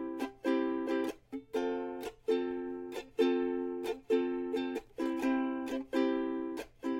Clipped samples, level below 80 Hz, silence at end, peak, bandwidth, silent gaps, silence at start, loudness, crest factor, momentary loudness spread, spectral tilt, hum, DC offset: under 0.1%; -66 dBFS; 0 s; -16 dBFS; 16.5 kHz; none; 0 s; -35 LUFS; 18 dB; 8 LU; -5 dB/octave; none; under 0.1%